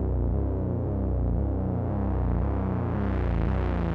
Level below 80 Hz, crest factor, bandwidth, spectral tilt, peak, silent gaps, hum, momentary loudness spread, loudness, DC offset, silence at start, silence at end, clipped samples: -30 dBFS; 12 dB; 4.2 kHz; -11 dB/octave; -14 dBFS; none; none; 1 LU; -28 LUFS; under 0.1%; 0 s; 0 s; under 0.1%